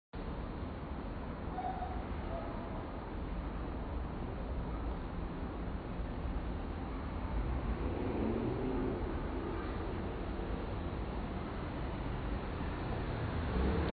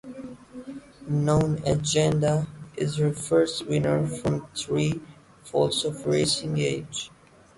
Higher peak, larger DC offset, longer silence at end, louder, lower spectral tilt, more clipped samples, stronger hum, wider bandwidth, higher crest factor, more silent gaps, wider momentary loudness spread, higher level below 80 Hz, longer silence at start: second, -22 dBFS vs -10 dBFS; neither; second, 0 s vs 0.5 s; second, -40 LUFS vs -25 LUFS; first, -7 dB/octave vs -5.5 dB/octave; neither; neither; second, 4.8 kHz vs 11.5 kHz; about the same, 16 dB vs 16 dB; neither; second, 6 LU vs 18 LU; first, -42 dBFS vs -52 dBFS; about the same, 0.15 s vs 0.05 s